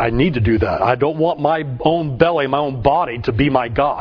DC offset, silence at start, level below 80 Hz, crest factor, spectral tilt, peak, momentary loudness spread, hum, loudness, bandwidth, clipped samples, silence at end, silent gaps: under 0.1%; 0 s; -34 dBFS; 16 dB; -9 dB/octave; 0 dBFS; 3 LU; none; -17 LUFS; 5.4 kHz; under 0.1%; 0 s; none